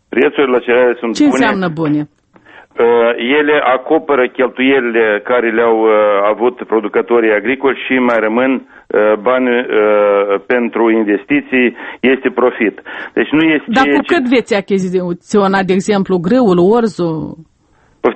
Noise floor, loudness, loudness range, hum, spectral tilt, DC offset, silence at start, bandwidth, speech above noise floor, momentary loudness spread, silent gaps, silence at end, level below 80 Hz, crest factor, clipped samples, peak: -52 dBFS; -12 LUFS; 2 LU; none; -6 dB/octave; under 0.1%; 0.1 s; 8.8 kHz; 40 dB; 6 LU; none; 0 s; -52 dBFS; 12 dB; under 0.1%; 0 dBFS